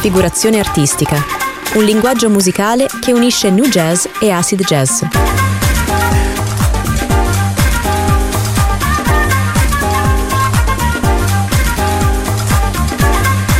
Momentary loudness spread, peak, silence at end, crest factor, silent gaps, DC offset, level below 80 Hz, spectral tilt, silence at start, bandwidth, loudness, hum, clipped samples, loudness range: 4 LU; 0 dBFS; 0 s; 12 dB; none; under 0.1%; -20 dBFS; -4.5 dB/octave; 0 s; 16.5 kHz; -13 LUFS; none; under 0.1%; 2 LU